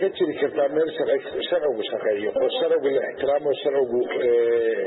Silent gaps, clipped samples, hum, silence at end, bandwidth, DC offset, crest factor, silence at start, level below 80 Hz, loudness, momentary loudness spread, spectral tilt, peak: none; under 0.1%; none; 0 s; 4.1 kHz; under 0.1%; 12 dB; 0 s; -66 dBFS; -23 LUFS; 4 LU; -9 dB/octave; -10 dBFS